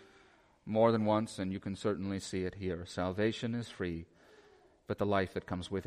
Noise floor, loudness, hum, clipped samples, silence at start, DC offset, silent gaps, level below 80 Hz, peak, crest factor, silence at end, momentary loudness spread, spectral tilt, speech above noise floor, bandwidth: -64 dBFS; -35 LUFS; none; under 0.1%; 0 s; under 0.1%; none; -62 dBFS; -14 dBFS; 20 dB; 0 s; 11 LU; -6.5 dB/octave; 30 dB; 12 kHz